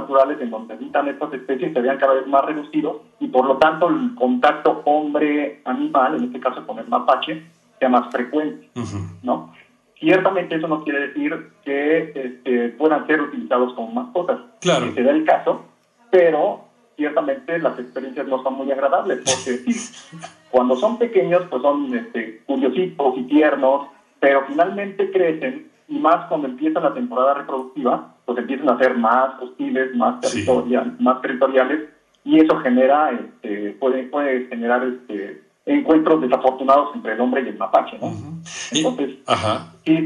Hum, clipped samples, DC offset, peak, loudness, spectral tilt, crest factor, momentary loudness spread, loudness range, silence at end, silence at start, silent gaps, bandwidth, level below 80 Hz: none; under 0.1%; under 0.1%; -4 dBFS; -20 LUFS; -5 dB/octave; 16 dB; 12 LU; 3 LU; 0 s; 0 s; none; 11.5 kHz; -66 dBFS